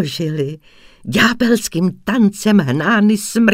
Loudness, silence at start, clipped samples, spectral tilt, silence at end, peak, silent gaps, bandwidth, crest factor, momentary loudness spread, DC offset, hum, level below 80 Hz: -15 LUFS; 0 s; under 0.1%; -5 dB/octave; 0 s; 0 dBFS; none; 16 kHz; 16 dB; 10 LU; under 0.1%; none; -48 dBFS